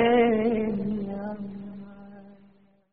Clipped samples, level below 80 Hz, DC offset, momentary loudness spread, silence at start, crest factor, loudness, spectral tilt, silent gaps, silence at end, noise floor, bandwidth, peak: under 0.1%; -56 dBFS; 0.3%; 24 LU; 0 s; 18 dB; -26 LUFS; -5 dB/octave; none; 0.6 s; -59 dBFS; 4.6 kHz; -10 dBFS